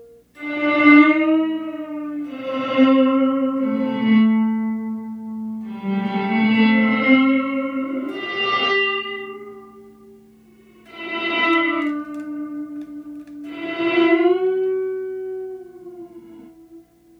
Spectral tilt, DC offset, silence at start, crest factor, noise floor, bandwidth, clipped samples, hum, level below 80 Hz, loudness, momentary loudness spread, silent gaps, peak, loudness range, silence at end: -7 dB/octave; under 0.1%; 0 s; 20 dB; -50 dBFS; 6 kHz; under 0.1%; 60 Hz at -60 dBFS; -68 dBFS; -19 LUFS; 19 LU; none; 0 dBFS; 7 LU; 0.4 s